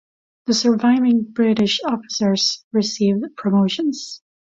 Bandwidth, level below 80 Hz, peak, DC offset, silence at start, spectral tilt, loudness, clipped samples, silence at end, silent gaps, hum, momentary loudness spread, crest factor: 7.8 kHz; -60 dBFS; -6 dBFS; under 0.1%; 0.45 s; -4.5 dB/octave; -18 LUFS; under 0.1%; 0.25 s; 2.64-2.71 s; none; 7 LU; 14 dB